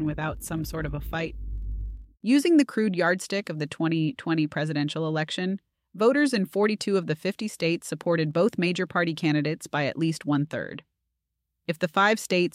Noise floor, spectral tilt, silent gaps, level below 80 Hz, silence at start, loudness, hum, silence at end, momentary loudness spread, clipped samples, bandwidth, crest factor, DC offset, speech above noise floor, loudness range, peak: -81 dBFS; -5.5 dB/octave; none; -44 dBFS; 0 s; -26 LUFS; none; 0.05 s; 12 LU; under 0.1%; 15.5 kHz; 18 dB; under 0.1%; 56 dB; 2 LU; -8 dBFS